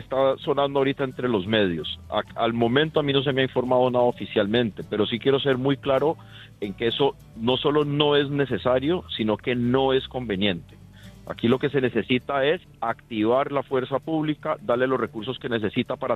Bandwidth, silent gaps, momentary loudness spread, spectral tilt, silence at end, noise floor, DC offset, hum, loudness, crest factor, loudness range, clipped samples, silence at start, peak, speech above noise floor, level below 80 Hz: 8.2 kHz; none; 7 LU; -7.5 dB/octave; 0 s; -46 dBFS; under 0.1%; none; -24 LUFS; 18 dB; 2 LU; under 0.1%; 0 s; -6 dBFS; 22 dB; -54 dBFS